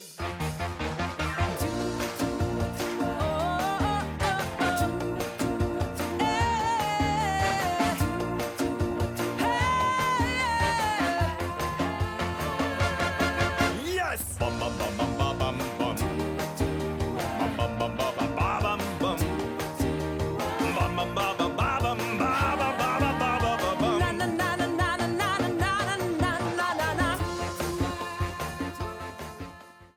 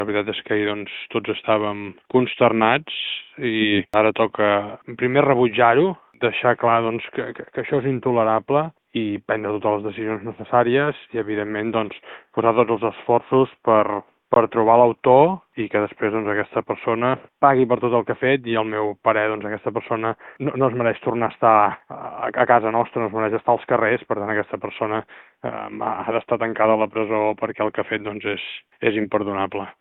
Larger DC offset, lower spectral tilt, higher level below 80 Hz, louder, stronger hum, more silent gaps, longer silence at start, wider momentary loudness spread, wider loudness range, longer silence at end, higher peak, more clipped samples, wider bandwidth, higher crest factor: neither; second, -5 dB/octave vs -9 dB/octave; first, -42 dBFS vs -62 dBFS; second, -28 LUFS vs -21 LUFS; neither; neither; about the same, 0 s vs 0 s; second, 6 LU vs 11 LU; about the same, 3 LU vs 4 LU; about the same, 0.1 s vs 0.1 s; second, -12 dBFS vs 0 dBFS; neither; first, 19.5 kHz vs 4.1 kHz; about the same, 16 dB vs 20 dB